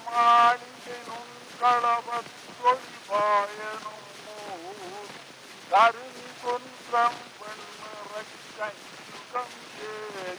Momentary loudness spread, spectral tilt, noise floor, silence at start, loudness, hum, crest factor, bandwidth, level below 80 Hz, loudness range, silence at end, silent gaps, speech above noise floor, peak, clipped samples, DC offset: 21 LU; -2 dB/octave; -46 dBFS; 0 s; -25 LUFS; none; 20 dB; over 20 kHz; -80 dBFS; 7 LU; 0 s; none; 22 dB; -8 dBFS; under 0.1%; under 0.1%